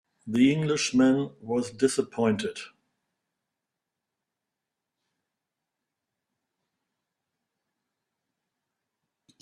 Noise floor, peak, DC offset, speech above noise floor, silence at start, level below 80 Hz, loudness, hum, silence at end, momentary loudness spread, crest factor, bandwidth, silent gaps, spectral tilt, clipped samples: -86 dBFS; -10 dBFS; under 0.1%; 61 dB; 0.25 s; -68 dBFS; -26 LUFS; none; 6.75 s; 10 LU; 20 dB; 11.5 kHz; none; -5 dB/octave; under 0.1%